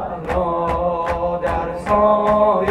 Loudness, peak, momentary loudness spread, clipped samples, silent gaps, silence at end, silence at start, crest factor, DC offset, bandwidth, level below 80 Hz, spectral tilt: -18 LUFS; -4 dBFS; 7 LU; under 0.1%; none; 0 s; 0 s; 14 dB; under 0.1%; 11.5 kHz; -34 dBFS; -7.5 dB/octave